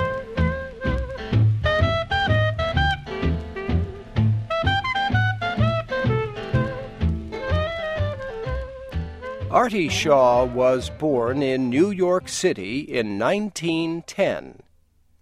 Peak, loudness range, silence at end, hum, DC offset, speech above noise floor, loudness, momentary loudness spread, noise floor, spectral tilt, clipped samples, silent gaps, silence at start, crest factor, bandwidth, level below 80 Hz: -4 dBFS; 5 LU; 0.7 s; none; under 0.1%; 37 dB; -23 LUFS; 8 LU; -59 dBFS; -6 dB/octave; under 0.1%; none; 0 s; 18 dB; 12.5 kHz; -36 dBFS